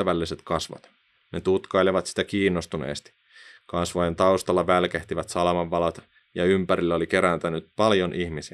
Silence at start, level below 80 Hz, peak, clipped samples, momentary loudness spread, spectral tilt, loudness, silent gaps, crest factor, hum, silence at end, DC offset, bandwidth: 0 s; -56 dBFS; -4 dBFS; under 0.1%; 10 LU; -5.5 dB/octave; -24 LUFS; none; 20 dB; none; 0.05 s; under 0.1%; 12.5 kHz